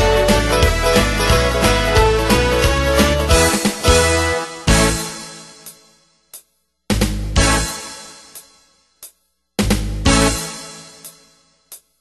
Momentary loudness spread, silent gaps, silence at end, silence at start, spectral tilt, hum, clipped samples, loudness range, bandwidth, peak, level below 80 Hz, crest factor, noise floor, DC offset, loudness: 19 LU; none; 0.25 s; 0 s; -4 dB/octave; none; under 0.1%; 8 LU; 13 kHz; 0 dBFS; -24 dBFS; 18 dB; -59 dBFS; under 0.1%; -15 LUFS